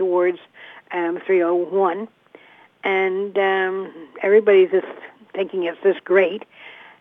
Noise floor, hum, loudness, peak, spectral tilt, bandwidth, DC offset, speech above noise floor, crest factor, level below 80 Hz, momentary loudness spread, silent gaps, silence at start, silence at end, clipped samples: -49 dBFS; none; -20 LUFS; -4 dBFS; -7.5 dB/octave; 3.8 kHz; under 0.1%; 29 dB; 18 dB; -82 dBFS; 19 LU; none; 0 s; 0.25 s; under 0.1%